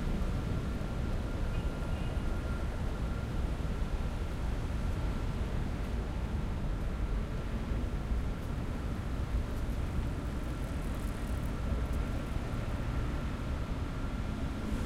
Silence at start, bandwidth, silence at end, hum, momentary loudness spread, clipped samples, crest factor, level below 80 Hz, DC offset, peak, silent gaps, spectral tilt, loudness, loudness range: 0 s; 15 kHz; 0 s; none; 2 LU; under 0.1%; 14 dB; -36 dBFS; under 0.1%; -20 dBFS; none; -7 dB/octave; -37 LUFS; 0 LU